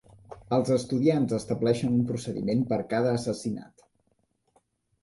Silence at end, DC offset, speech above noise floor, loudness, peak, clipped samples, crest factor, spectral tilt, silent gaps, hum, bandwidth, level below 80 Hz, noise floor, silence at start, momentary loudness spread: 1.4 s; under 0.1%; 46 dB; -27 LUFS; -10 dBFS; under 0.1%; 18 dB; -7 dB/octave; none; none; 11.5 kHz; -60 dBFS; -72 dBFS; 0.3 s; 7 LU